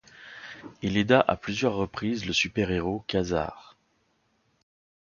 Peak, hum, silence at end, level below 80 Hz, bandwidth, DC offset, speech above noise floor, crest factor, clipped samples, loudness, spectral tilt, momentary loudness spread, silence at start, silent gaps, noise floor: -4 dBFS; none; 1.55 s; -50 dBFS; 7.2 kHz; under 0.1%; 44 dB; 24 dB; under 0.1%; -27 LUFS; -5 dB/octave; 20 LU; 0.15 s; none; -70 dBFS